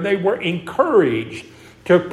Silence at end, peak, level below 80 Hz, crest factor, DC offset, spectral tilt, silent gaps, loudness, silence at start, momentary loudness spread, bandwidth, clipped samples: 0 s; -2 dBFS; -58 dBFS; 18 dB; under 0.1%; -7 dB/octave; none; -18 LUFS; 0 s; 18 LU; 12 kHz; under 0.1%